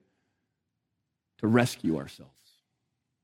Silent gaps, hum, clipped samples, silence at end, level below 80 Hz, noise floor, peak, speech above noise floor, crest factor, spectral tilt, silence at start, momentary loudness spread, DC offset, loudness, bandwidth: none; none; under 0.1%; 1 s; -68 dBFS; -83 dBFS; -8 dBFS; 55 dB; 26 dB; -6 dB/octave; 1.4 s; 11 LU; under 0.1%; -28 LUFS; 16 kHz